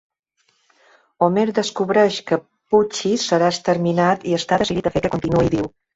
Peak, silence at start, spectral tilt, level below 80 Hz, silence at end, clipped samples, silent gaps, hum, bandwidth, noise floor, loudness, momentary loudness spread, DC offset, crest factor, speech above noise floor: -2 dBFS; 1.2 s; -5.5 dB/octave; -48 dBFS; 0.25 s; under 0.1%; none; none; 8 kHz; -66 dBFS; -19 LUFS; 4 LU; under 0.1%; 18 dB; 48 dB